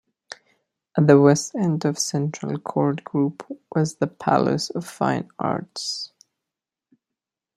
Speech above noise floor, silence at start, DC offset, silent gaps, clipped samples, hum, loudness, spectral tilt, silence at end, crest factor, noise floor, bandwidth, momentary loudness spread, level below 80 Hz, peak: 65 dB; 0.95 s; under 0.1%; none; under 0.1%; none; -22 LUFS; -5.5 dB/octave; 1.5 s; 22 dB; -87 dBFS; 13.5 kHz; 16 LU; -64 dBFS; -2 dBFS